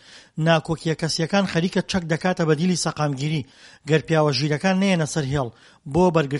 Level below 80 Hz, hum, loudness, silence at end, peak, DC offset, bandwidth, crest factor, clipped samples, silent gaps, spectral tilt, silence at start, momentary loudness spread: -50 dBFS; none; -22 LUFS; 0 s; -2 dBFS; under 0.1%; 11.5 kHz; 20 dB; under 0.1%; none; -5.5 dB/octave; 0.1 s; 7 LU